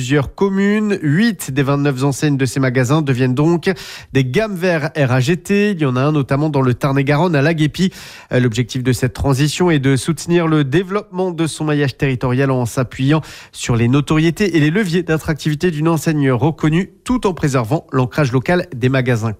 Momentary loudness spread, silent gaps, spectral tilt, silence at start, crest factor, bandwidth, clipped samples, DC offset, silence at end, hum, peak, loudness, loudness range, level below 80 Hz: 5 LU; none; -6.5 dB/octave; 0 s; 12 dB; 15 kHz; under 0.1%; under 0.1%; 0.05 s; none; -4 dBFS; -16 LUFS; 1 LU; -40 dBFS